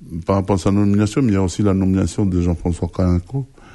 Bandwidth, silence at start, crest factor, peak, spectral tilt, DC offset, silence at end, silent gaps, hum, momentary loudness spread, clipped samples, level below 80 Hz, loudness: 11.5 kHz; 0 s; 14 dB; -2 dBFS; -7.5 dB/octave; under 0.1%; 0.3 s; none; none; 5 LU; under 0.1%; -36 dBFS; -18 LUFS